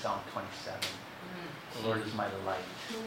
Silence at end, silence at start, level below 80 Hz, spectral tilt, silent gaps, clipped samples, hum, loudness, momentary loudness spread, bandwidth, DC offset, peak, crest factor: 0 s; 0 s; -70 dBFS; -4 dB/octave; none; under 0.1%; none; -38 LUFS; 9 LU; 16 kHz; under 0.1%; -18 dBFS; 20 dB